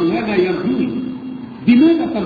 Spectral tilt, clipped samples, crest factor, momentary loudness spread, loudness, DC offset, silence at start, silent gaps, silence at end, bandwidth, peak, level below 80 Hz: -9 dB/octave; under 0.1%; 14 dB; 15 LU; -16 LUFS; under 0.1%; 0 s; none; 0 s; 4.9 kHz; -2 dBFS; -50 dBFS